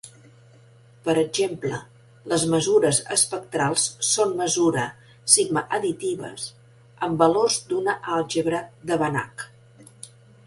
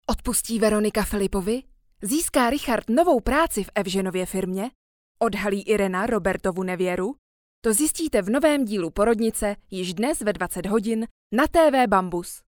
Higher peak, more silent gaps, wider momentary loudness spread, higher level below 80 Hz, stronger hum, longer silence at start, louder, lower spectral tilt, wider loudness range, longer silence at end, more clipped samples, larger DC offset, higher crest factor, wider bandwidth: first, -2 dBFS vs -6 dBFS; second, none vs 4.75-5.15 s, 7.18-7.62 s, 11.11-11.30 s; first, 16 LU vs 9 LU; second, -60 dBFS vs -42 dBFS; neither; about the same, 0.05 s vs 0.1 s; about the same, -22 LUFS vs -23 LUFS; second, -3 dB/octave vs -4.5 dB/octave; about the same, 3 LU vs 3 LU; first, 0.4 s vs 0.1 s; neither; neither; first, 24 dB vs 18 dB; second, 12 kHz vs 19.5 kHz